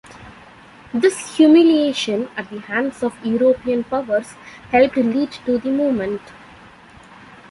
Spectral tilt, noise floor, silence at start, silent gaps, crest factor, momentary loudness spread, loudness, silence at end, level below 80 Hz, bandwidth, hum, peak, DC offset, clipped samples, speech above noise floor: -5 dB/octave; -44 dBFS; 0.15 s; none; 16 dB; 14 LU; -18 LUFS; 1.2 s; -54 dBFS; 11.5 kHz; none; -2 dBFS; under 0.1%; under 0.1%; 26 dB